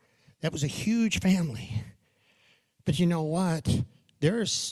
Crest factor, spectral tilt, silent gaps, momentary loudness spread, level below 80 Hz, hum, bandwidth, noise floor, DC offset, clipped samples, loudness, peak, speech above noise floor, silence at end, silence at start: 18 dB; -5 dB/octave; none; 11 LU; -52 dBFS; none; 13.5 kHz; -66 dBFS; under 0.1%; under 0.1%; -28 LUFS; -10 dBFS; 39 dB; 0 s; 0.45 s